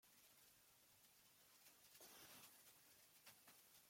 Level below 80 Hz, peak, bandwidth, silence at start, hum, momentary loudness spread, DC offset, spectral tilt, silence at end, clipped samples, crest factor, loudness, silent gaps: under -90 dBFS; -50 dBFS; 16.5 kHz; 0 s; none; 7 LU; under 0.1%; -1 dB/octave; 0 s; under 0.1%; 20 dB; -66 LUFS; none